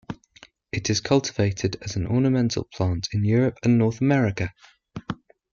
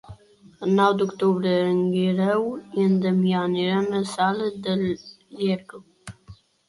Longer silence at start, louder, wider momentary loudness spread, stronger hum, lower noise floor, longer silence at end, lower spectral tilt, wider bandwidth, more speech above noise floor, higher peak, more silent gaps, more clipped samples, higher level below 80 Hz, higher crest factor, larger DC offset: about the same, 0.1 s vs 0.1 s; about the same, -23 LUFS vs -23 LUFS; first, 16 LU vs 10 LU; neither; about the same, -53 dBFS vs -50 dBFS; about the same, 0.4 s vs 0.35 s; about the same, -6 dB/octave vs -7 dB/octave; second, 7.4 kHz vs 11.5 kHz; about the same, 31 dB vs 28 dB; about the same, -6 dBFS vs -6 dBFS; neither; neither; first, -50 dBFS vs -60 dBFS; about the same, 18 dB vs 18 dB; neither